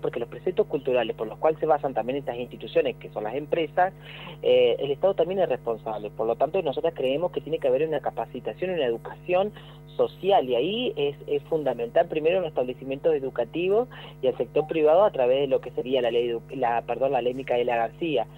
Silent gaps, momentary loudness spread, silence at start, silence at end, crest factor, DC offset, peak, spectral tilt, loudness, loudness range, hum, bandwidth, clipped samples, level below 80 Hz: none; 9 LU; 0 s; 0 s; 16 dB; under 0.1%; -8 dBFS; -7.5 dB/octave; -26 LUFS; 3 LU; 50 Hz at -45 dBFS; 16 kHz; under 0.1%; -56 dBFS